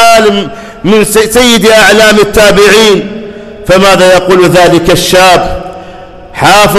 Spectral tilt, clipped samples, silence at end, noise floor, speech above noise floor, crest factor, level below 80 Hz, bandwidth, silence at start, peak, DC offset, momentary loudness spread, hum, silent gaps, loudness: -3.5 dB/octave; 3%; 0 s; -26 dBFS; 23 dB; 4 dB; -26 dBFS; 17.5 kHz; 0 s; 0 dBFS; under 0.1%; 17 LU; none; none; -4 LUFS